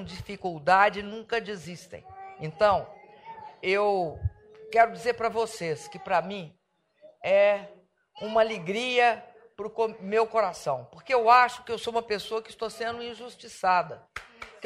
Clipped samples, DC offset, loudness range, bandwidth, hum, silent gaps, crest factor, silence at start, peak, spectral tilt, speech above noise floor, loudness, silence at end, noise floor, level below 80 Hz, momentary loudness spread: under 0.1%; under 0.1%; 4 LU; 14.5 kHz; none; none; 22 dB; 0 s; -6 dBFS; -4.5 dB/octave; 33 dB; -26 LUFS; 0 s; -59 dBFS; -56 dBFS; 20 LU